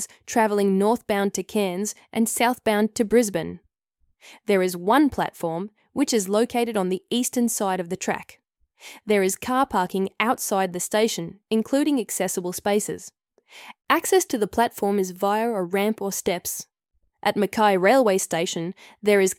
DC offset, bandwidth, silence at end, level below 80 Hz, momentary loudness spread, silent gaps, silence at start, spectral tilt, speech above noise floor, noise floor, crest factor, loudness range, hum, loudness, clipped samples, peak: under 0.1%; 17 kHz; 0.05 s; -60 dBFS; 10 LU; none; 0 s; -4 dB/octave; 46 dB; -69 dBFS; 20 dB; 2 LU; none; -23 LUFS; under 0.1%; -4 dBFS